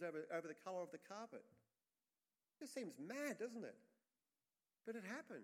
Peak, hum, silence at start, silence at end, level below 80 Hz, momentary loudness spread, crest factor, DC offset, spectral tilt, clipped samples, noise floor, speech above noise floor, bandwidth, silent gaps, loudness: -34 dBFS; none; 0 s; 0 s; under -90 dBFS; 10 LU; 20 dB; under 0.1%; -4.5 dB/octave; under 0.1%; under -90 dBFS; over 39 dB; 16 kHz; none; -51 LUFS